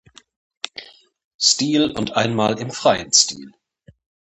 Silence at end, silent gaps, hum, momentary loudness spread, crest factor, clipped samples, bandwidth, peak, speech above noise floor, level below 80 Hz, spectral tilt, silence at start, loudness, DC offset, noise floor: 0.85 s; 1.24-1.39 s; none; 18 LU; 22 dB; under 0.1%; 9.2 kHz; 0 dBFS; 22 dB; -56 dBFS; -2.5 dB/octave; 0.75 s; -17 LUFS; under 0.1%; -41 dBFS